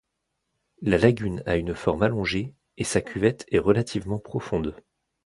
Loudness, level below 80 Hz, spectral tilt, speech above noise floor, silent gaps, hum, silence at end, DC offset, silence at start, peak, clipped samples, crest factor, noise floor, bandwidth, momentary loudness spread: -25 LUFS; -46 dBFS; -6 dB/octave; 55 dB; none; none; 0.5 s; under 0.1%; 0.8 s; -4 dBFS; under 0.1%; 22 dB; -79 dBFS; 11.5 kHz; 10 LU